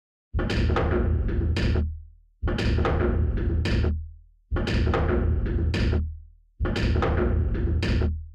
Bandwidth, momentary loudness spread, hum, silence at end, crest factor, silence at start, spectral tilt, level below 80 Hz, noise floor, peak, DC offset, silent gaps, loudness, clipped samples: 8.4 kHz; 9 LU; none; 0 s; 10 dB; 0.35 s; -7.5 dB/octave; -28 dBFS; -44 dBFS; -14 dBFS; under 0.1%; none; -26 LUFS; under 0.1%